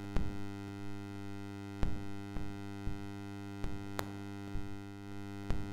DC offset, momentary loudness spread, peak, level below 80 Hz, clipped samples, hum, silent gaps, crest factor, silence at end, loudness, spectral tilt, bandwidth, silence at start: under 0.1%; 4 LU; -14 dBFS; -46 dBFS; under 0.1%; none; none; 24 dB; 0 s; -44 LUFS; -6.5 dB/octave; 17.5 kHz; 0 s